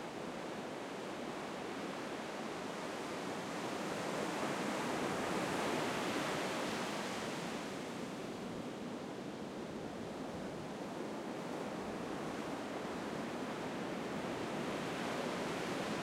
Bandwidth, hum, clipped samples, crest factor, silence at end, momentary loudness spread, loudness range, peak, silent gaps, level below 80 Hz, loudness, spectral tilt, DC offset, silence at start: 16 kHz; none; under 0.1%; 16 dB; 0 s; 7 LU; 6 LU; -24 dBFS; none; -70 dBFS; -41 LUFS; -4.5 dB/octave; under 0.1%; 0 s